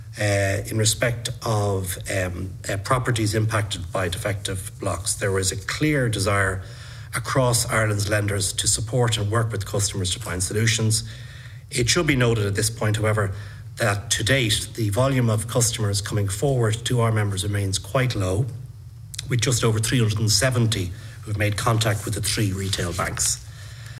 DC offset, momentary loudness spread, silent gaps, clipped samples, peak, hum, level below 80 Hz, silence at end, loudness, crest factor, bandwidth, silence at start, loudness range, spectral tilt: under 0.1%; 9 LU; none; under 0.1%; -4 dBFS; none; -44 dBFS; 0 s; -22 LUFS; 20 dB; 16 kHz; 0 s; 2 LU; -4 dB/octave